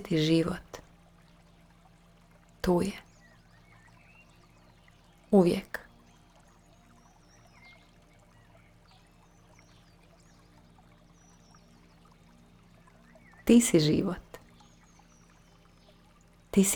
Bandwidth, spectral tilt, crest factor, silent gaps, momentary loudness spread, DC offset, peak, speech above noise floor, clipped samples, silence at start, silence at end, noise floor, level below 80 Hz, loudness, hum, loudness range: over 20 kHz; -5 dB/octave; 24 dB; none; 25 LU; under 0.1%; -8 dBFS; 34 dB; under 0.1%; 0 s; 0 s; -59 dBFS; -56 dBFS; -27 LUFS; none; 8 LU